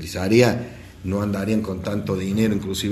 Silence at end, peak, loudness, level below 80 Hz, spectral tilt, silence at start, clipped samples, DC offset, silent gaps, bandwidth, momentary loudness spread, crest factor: 0 s; -2 dBFS; -22 LUFS; -46 dBFS; -6 dB/octave; 0 s; under 0.1%; under 0.1%; none; 13 kHz; 11 LU; 20 dB